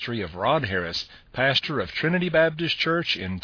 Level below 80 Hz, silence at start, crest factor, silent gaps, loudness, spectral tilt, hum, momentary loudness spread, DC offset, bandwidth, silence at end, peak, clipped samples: -52 dBFS; 0 s; 18 dB; none; -24 LUFS; -5.5 dB/octave; none; 8 LU; under 0.1%; 5.4 kHz; 0.05 s; -6 dBFS; under 0.1%